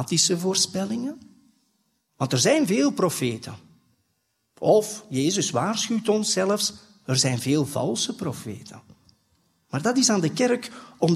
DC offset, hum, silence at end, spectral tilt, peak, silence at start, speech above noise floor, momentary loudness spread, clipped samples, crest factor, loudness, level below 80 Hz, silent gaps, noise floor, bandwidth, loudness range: under 0.1%; none; 0 s; -4 dB/octave; -6 dBFS; 0 s; 50 dB; 14 LU; under 0.1%; 20 dB; -23 LUFS; -66 dBFS; none; -73 dBFS; 15.5 kHz; 3 LU